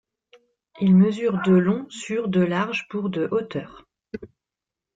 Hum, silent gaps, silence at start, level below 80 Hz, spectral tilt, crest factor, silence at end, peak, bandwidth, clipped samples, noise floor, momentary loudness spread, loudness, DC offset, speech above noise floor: none; none; 0.75 s; -62 dBFS; -7.5 dB/octave; 16 dB; 0.7 s; -8 dBFS; 7.8 kHz; under 0.1%; -88 dBFS; 21 LU; -22 LUFS; under 0.1%; 66 dB